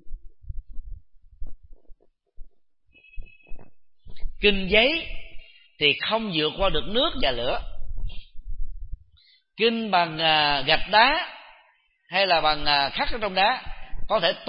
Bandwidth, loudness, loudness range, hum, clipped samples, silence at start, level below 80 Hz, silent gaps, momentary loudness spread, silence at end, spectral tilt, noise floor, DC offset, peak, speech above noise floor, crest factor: 5.4 kHz; -22 LUFS; 6 LU; none; under 0.1%; 0.05 s; -36 dBFS; none; 24 LU; 0 s; -8.5 dB/octave; -62 dBFS; under 0.1%; -2 dBFS; 40 dB; 22 dB